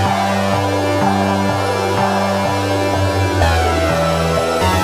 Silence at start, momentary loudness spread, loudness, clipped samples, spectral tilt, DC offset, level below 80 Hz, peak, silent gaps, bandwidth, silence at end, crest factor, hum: 0 s; 2 LU; -16 LUFS; under 0.1%; -5.5 dB/octave; under 0.1%; -30 dBFS; 0 dBFS; none; 16 kHz; 0 s; 14 dB; none